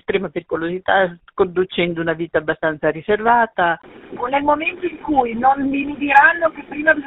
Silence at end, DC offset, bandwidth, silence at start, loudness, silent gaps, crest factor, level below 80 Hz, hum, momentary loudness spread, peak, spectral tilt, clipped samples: 0 s; under 0.1%; 5.2 kHz; 0.1 s; -18 LUFS; none; 18 dB; -50 dBFS; none; 9 LU; 0 dBFS; -7.5 dB/octave; under 0.1%